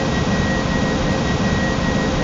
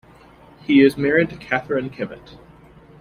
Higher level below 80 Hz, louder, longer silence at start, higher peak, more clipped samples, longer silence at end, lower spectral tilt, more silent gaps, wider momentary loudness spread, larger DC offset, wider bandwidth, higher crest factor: first, -28 dBFS vs -52 dBFS; about the same, -19 LUFS vs -19 LUFS; second, 0 s vs 0.7 s; second, -6 dBFS vs -2 dBFS; neither; second, 0 s vs 0.85 s; second, -5.5 dB/octave vs -7 dB/octave; neither; second, 1 LU vs 17 LU; first, 0.5% vs under 0.1%; second, 8 kHz vs 14 kHz; second, 12 dB vs 18 dB